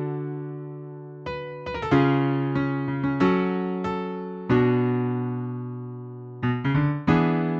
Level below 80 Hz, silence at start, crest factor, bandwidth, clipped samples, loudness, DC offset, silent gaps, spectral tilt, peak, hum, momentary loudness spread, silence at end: -52 dBFS; 0 s; 18 dB; 6.8 kHz; under 0.1%; -25 LUFS; under 0.1%; none; -9 dB/octave; -6 dBFS; none; 15 LU; 0 s